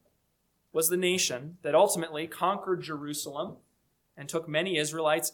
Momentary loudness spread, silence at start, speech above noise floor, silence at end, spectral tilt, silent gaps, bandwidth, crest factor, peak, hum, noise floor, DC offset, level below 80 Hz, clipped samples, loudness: 11 LU; 0.75 s; 45 dB; 0.05 s; -3 dB/octave; none; 19 kHz; 20 dB; -10 dBFS; none; -74 dBFS; under 0.1%; -76 dBFS; under 0.1%; -29 LUFS